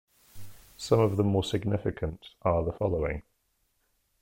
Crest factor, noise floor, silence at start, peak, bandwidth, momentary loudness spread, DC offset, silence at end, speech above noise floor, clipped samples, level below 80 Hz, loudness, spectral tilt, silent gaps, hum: 20 dB; -74 dBFS; 0.35 s; -10 dBFS; 16.5 kHz; 11 LU; under 0.1%; 1 s; 46 dB; under 0.1%; -46 dBFS; -29 LUFS; -7 dB/octave; none; none